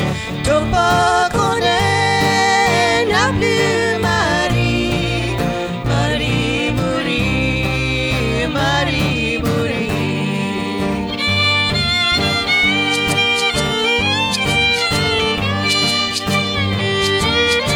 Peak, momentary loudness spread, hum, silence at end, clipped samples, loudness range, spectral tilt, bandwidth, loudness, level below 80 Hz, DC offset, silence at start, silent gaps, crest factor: -2 dBFS; 5 LU; none; 0 s; under 0.1%; 3 LU; -4 dB/octave; over 20 kHz; -15 LUFS; -32 dBFS; under 0.1%; 0 s; none; 14 dB